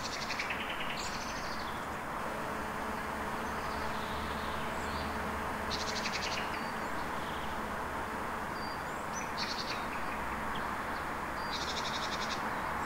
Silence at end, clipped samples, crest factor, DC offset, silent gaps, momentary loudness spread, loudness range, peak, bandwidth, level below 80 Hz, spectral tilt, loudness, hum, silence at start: 0 s; under 0.1%; 14 dB; 0.1%; none; 3 LU; 1 LU; -22 dBFS; 16 kHz; -52 dBFS; -3.5 dB/octave; -36 LUFS; none; 0 s